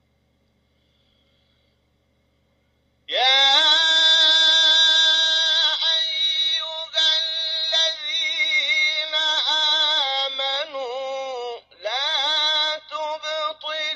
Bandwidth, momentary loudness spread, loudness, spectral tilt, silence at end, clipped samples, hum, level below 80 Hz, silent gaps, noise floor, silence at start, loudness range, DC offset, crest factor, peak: 8.8 kHz; 15 LU; -17 LUFS; 3 dB/octave; 0 s; under 0.1%; none; -74 dBFS; none; -66 dBFS; 3.1 s; 9 LU; under 0.1%; 16 dB; -4 dBFS